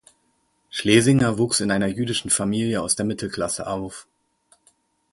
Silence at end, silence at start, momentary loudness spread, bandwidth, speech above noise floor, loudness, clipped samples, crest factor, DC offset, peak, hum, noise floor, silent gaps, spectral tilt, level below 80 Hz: 1.1 s; 0.75 s; 13 LU; 11.5 kHz; 46 dB; -21 LUFS; under 0.1%; 20 dB; under 0.1%; -2 dBFS; none; -67 dBFS; none; -4 dB/octave; -52 dBFS